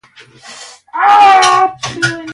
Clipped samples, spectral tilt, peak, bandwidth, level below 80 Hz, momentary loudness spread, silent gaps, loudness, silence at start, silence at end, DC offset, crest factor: under 0.1%; -2.5 dB/octave; 0 dBFS; 11.5 kHz; -54 dBFS; 22 LU; none; -9 LUFS; 0.45 s; 0 s; under 0.1%; 12 dB